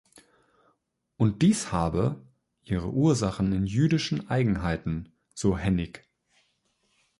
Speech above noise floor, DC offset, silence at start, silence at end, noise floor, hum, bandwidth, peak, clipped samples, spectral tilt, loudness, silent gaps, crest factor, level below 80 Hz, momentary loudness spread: 48 dB; under 0.1%; 1.2 s; 1.2 s; -74 dBFS; none; 11.5 kHz; -10 dBFS; under 0.1%; -6.5 dB/octave; -27 LUFS; none; 18 dB; -46 dBFS; 10 LU